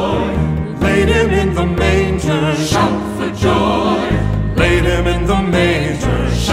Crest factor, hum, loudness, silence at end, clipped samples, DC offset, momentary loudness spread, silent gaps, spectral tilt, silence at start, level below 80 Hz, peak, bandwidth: 12 dB; none; -15 LUFS; 0 s; under 0.1%; under 0.1%; 4 LU; none; -6 dB/octave; 0 s; -22 dBFS; -2 dBFS; 15.5 kHz